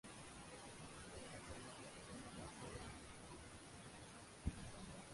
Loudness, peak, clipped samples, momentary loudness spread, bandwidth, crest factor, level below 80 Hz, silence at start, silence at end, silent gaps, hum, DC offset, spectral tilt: -55 LUFS; -30 dBFS; under 0.1%; 6 LU; 11.5 kHz; 26 dB; -62 dBFS; 0.05 s; 0 s; none; none; under 0.1%; -4 dB/octave